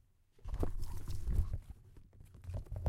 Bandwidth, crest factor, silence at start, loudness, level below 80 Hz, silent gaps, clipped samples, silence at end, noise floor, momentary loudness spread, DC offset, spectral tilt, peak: 15 kHz; 20 dB; 0.45 s; -43 LUFS; -42 dBFS; none; under 0.1%; 0 s; -57 dBFS; 20 LU; under 0.1%; -7.5 dB/octave; -18 dBFS